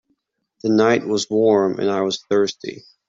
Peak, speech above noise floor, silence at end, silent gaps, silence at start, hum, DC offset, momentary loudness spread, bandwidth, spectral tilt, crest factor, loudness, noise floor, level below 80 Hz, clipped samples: -2 dBFS; 51 dB; 0.3 s; none; 0.65 s; none; under 0.1%; 10 LU; 7.8 kHz; -5 dB/octave; 16 dB; -19 LUFS; -70 dBFS; -64 dBFS; under 0.1%